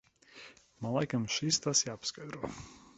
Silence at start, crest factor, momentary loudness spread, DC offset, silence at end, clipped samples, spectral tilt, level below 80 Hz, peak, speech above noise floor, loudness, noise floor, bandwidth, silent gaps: 0.35 s; 22 dB; 23 LU; under 0.1%; 0.2 s; under 0.1%; -3 dB/octave; -66 dBFS; -14 dBFS; 21 dB; -33 LUFS; -55 dBFS; 8.6 kHz; none